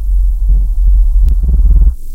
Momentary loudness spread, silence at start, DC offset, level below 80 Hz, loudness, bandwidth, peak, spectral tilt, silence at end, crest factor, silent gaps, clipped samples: 3 LU; 0 s; under 0.1%; -8 dBFS; -13 LUFS; 0.8 kHz; 0 dBFS; -9.5 dB/octave; 0 s; 8 dB; none; under 0.1%